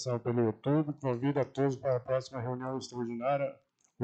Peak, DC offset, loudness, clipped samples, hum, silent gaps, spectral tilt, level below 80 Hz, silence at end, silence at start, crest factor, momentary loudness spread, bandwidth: -18 dBFS; under 0.1%; -33 LUFS; under 0.1%; none; none; -7.5 dB/octave; -70 dBFS; 0 s; 0 s; 14 dB; 7 LU; 8.6 kHz